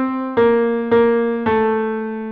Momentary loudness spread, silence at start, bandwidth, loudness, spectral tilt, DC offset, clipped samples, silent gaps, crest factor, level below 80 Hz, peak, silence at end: 6 LU; 0 s; 4.6 kHz; -17 LUFS; -9 dB/octave; under 0.1%; under 0.1%; none; 12 dB; -50 dBFS; -4 dBFS; 0 s